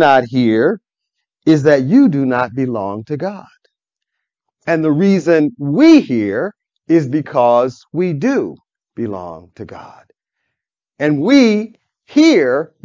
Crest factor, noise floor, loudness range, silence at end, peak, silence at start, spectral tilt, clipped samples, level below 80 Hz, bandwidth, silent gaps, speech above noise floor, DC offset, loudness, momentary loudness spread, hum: 14 dB; -79 dBFS; 6 LU; 0.2 s; 0 dBFS; 0 s; -7 dB/octave; under 0.1%; -58 dBFS; 7.6 kHz; none; 66 dB; under 0.1%; -14 LUFS; 16 LU; none